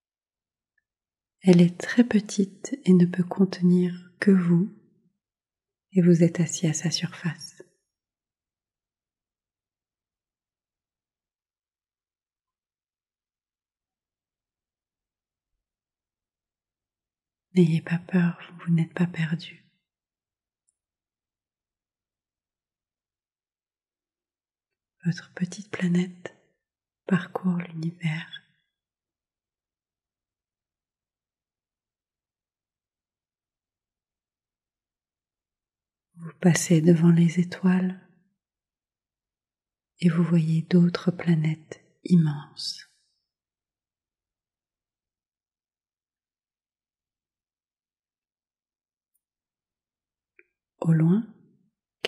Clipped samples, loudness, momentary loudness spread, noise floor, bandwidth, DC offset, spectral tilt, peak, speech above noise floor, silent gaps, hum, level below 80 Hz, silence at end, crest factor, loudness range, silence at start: under 0.1%; -24 LUFS; 14 LU; under -90 dBFS; 11.5 kHz; under 0.1%; -6.5 dB/octave; -6 dBFS; over 67 dB; 48.18-48.22 s; none; -80 dBFS; 0 s; 22 dB; 12 LU; 1.45 s